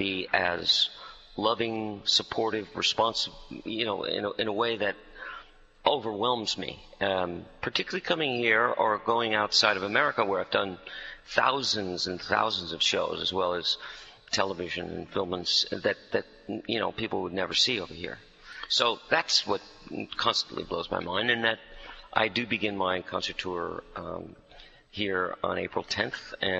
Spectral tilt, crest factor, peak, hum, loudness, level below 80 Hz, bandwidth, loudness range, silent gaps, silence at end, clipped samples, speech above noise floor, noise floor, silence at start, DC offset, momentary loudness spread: -3 dB/octave; 24 dB; -6 dBFS; none; -28 LUFS; -60 dBFS; 8.2 kHz; 5 LU; none; 0 s; under 0.1%; 24 dB; -53 dBFS; 0 s; under 0.1%; 15 LU